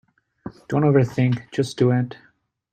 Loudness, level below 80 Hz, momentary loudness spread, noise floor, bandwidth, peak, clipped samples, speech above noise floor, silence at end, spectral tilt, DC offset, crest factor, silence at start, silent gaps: -21 LUFS; -56 dBFS; 21 LU; -40 dBFS; 9.2 kHz; -4 dBFS; under 0.1%; 20 dB; 0.6 s; -8 dB/octave; under 0.1%; 18 dB; 0.45 s; none